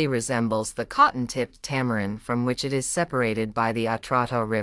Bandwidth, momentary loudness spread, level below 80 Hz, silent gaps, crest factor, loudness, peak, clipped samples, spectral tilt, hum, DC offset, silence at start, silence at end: 12 kHz; 8 LU; -52 dBFS; none; 18 dB; -25 LUFS; -6 dBFS; under 0.1%; -5 dB/octave; none; under 0.1%; 0 s; 0 s